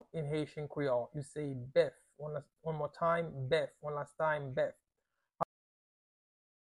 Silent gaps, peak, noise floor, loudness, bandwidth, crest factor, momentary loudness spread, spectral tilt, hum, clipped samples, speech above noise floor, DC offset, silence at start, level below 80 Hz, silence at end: none; -18 dBFS; -87 dBFS; -37 LUFS; 11.5 kHz; 20 dB; 10 LU; -6.5 dB/octave; none; under 0.1%; 51 dB; under 0.1%; 0.15 s; -70 dBFS; 1.3 s